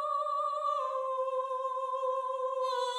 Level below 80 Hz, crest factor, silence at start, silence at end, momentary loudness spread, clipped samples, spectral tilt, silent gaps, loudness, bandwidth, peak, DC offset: under -90 dBFS; 12 dB; 0 s; 0 s; 2 LU; under 0.1%; 2.5 dB/octave; none; -33 LUFS; 11.5 kHz; -22 dBFS; under 0.1%